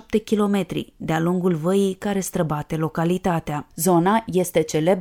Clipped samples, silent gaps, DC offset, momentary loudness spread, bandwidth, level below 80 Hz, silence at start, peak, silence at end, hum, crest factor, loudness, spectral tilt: under 0.1%; none; under 0.1%; 7 LU; 18.5 kHz; -50 dBFS; 0.1 s; -4 dBFS; 0 s; none; 16 dB; -22 LUFS; -6 dB/octave